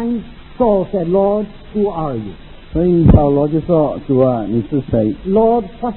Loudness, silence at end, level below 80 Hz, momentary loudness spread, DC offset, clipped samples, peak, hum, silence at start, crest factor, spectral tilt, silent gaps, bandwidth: -15 LUFS; 0 s; -28 dBFS; 11 LU; under 0.1%; under 0.1%; 0 dBFS; none; 0 s; 14 dB; -14.5 dB/octave; none; 4.2 kHz